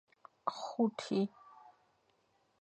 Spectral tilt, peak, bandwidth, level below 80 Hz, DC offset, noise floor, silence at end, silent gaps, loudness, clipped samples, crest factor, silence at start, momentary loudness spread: -6 dB/octave; -18 dBFS; 9 kHz; -86 dBFS; under 0.1%; -75 dBFS; 0.9 s; none; -37 LUFS; under 0.1%; 22 dB; 0.45 s; 7 LU